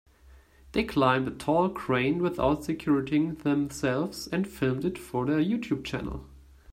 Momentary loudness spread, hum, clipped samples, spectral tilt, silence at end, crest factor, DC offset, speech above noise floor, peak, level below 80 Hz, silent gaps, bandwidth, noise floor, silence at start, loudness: 7 LU; none; under 0.1%; -6.5 dB/octave; 0.35 s; 20 dB; under 0.1%; 28 dB; -8 dBFS; -50 dBFS; none; 16 kHz; -55 dBFS; 0.3 s; -28 LUFS